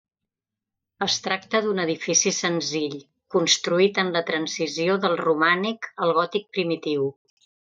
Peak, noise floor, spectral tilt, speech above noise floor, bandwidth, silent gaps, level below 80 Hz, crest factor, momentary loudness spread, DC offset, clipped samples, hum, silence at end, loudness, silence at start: -4 dBFS; -87 dBFS; -3 dB/octave; 64 dB; 9.2 kHz; none; -76 dBFS; 20 dB; 7 LU; under 0.1%; under 0.1%; none; 0.55 s; -23 LUFS; 1 s